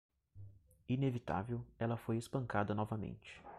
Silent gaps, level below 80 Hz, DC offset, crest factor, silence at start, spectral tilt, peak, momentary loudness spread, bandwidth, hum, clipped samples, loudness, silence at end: none; -64 dBFS; under 0.1%; 20 dB; 0.35 s; -7.5 dB/octave; -22 dBFS; 21 LU; 13 kHz; none; under 0.1%; -40 LUFS; 0 s